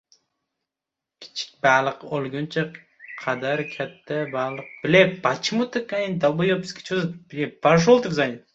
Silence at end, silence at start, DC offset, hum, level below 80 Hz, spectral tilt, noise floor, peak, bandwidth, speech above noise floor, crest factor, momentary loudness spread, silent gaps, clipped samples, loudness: 0.15 s; 1.2 s; under 0.1%; none; -62 dBFS; -5.5 dB/octave; -87 dBFS; -2 dBFS; 8 kHz; 64 dB; 22 dB; 13 LU; none; under 0.1%; -23 LUFS